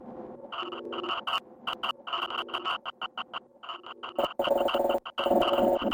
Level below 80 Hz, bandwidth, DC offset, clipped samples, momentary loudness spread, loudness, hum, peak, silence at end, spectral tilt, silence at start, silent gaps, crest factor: -62 dBFS; 17 kHz; under 0.1%; under 0.1%; 15 LU; -30 LUFS; none; -12 dBFS; 0 s; -4.5 dB/octave; 0 s; none; 18 dB